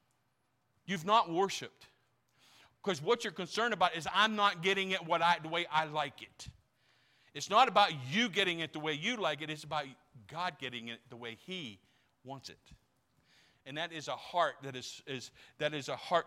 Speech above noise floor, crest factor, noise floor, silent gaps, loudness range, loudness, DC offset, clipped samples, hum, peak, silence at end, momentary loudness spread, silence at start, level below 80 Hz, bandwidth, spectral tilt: 44 dB; 22 dB; -78 dBFS; none; 13 LU; -33 LUFS; under 0.1%; under 0.1%; none; -14 dBFS; 0 s; 19 LU; 0.9 s; -74 dBFS; 16.5 kHz; -3.5 dB/octave